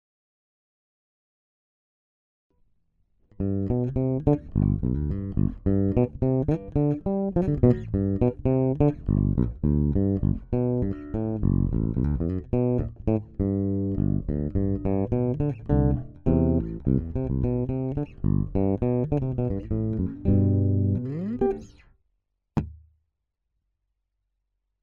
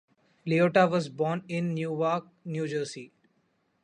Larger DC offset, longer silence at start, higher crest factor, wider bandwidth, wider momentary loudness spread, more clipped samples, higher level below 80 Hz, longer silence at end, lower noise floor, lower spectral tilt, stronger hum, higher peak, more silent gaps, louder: neither; first, 3.4 s vs 0.45 s; about the same, 20 dB vs 20 dB; second, 3.2 kHz vs 10.5 kHz; second, 6 LU vs 14 LU; neither; first, -36 dBFS vs -74 dBFS; first, 2.05 s vs 0.75 s; first, -80 dBFS vs -72 dBFS; first, -12.5 dB/octave vs -6.5 dB/octave; neither; about the same, -6 dBFS vs -8 dBFS; neither; about the same, -26 LUFS vs -28 LUFS